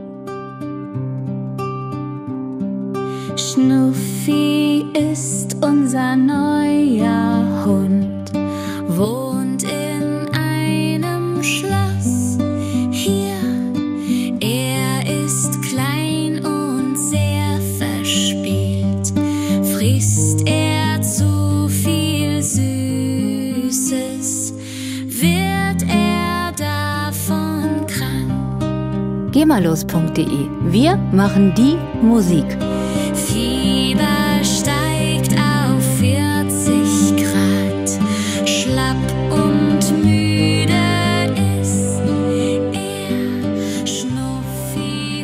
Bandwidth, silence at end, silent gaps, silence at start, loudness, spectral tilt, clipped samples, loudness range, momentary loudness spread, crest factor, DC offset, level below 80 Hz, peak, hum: 16 kHz; 0 s; none; 0 s; -17 LUFS; -5 dB/octave; under 0.1%; 4 LU; 8 LU; 14 dB; under 0.1%; -40 dBFS; -2 dBFS; none